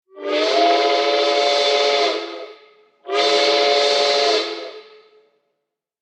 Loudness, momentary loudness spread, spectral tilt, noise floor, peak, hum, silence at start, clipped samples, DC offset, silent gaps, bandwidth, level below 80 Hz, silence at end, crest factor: -17 LUFS; 12 LU; 0 dB/octave; -78 dBFS; -4 dBFS; none; 0.15 s; under 0.1%; under 0.1%; none; 10 kHz; -82 dBFS; 1.2 s; 14 dB